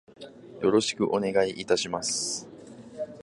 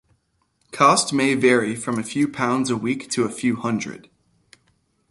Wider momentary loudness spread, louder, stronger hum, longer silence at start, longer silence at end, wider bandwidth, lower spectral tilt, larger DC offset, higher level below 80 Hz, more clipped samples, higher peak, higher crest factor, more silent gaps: first, 22 LU vs 10 LU; second, -27 LUFS vs -20 LUFS; neither; second, 0.2 s vs 0.75 s; second, 0 s vs 1.15 s; about the same, 11.5 kHz vs 11.5 kHz; about the same, -3 dB/octave vs -4 dB/octave; neither; about the same, -64 dBFS vs -62 dBFS; neither; second, -10 dBFS vs -2 dBFS; about the same, 18 dB vs 20 dB; neither